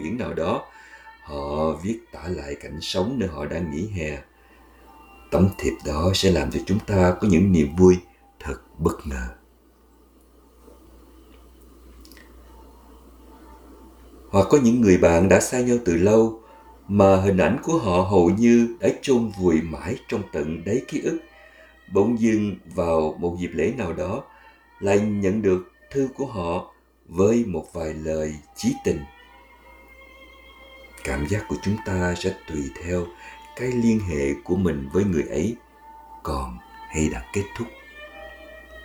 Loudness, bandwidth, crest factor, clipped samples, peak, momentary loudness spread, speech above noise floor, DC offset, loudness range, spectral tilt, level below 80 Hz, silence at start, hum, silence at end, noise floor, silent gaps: -22 LUFS; 19.5 kHz; 22 dB; under 0.1%; -2 dBFS; 17 LU; 34 dB; under 0.1%; 11 LU; -6.5 dB/octave; -42 dBFS; 0 s; none; 0 s; -55 dBFS; none